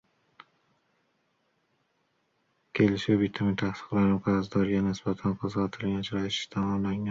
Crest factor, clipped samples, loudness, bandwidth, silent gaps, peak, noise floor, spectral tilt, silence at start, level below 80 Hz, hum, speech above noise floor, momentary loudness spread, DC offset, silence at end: 18 dB; under 0.1%; -28 LUFS; 7.6 kHz; none; -12 dBFS; -74 dBFS; -7 dB/octave; 2.75 s; -56 dBFS; none; 46 dB; 5 LU; under 0.1%; 0 s